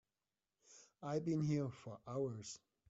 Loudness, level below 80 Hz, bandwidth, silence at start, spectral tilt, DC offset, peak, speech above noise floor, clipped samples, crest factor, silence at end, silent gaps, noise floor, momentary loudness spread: -43 LUFS; -78 dBFS; 8 kHz; 0.7 s; -8 dB/octave; under 0.1%; -28 dBFS; over 48 dB; under 0.1%; 16 dB; 0.3 s; none; under -90 dBFS; 16 LU